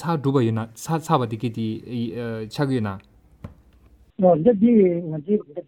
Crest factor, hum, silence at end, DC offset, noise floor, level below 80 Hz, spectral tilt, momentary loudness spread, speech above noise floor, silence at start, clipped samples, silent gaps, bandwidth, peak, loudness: 18 dB; none; 0.05 s; under 0.1%; -53 dBFS; -56 dBFS; -7.5 dB/octave; 12 LU; 32 dB; 0 s; under 0.1%; none; 16 kHz; -4 dBFS; -22 LUFS